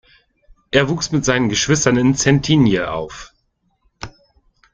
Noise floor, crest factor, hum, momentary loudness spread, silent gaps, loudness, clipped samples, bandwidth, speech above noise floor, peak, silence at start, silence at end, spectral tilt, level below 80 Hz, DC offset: -66 dBFS; 16 dB; none; 21 LU; none; -16 LUFS; under 0.1%; 9.6 kHz; 50 dB; -2 dBFS; 0.75 s; 0.65 s; -4.5 dB/octave; -42 dBFS; under 0.1%